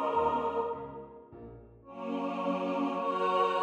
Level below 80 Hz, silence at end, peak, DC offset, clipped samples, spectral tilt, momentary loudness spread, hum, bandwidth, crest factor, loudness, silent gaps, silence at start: -62 dBFS; 0 s; -16 dBFS; under 0.1%; under 0.1%; -6.5 dB/octave; 21 LU; none; 9 kHz; 16 dB; -32 LUFS; none; 0 s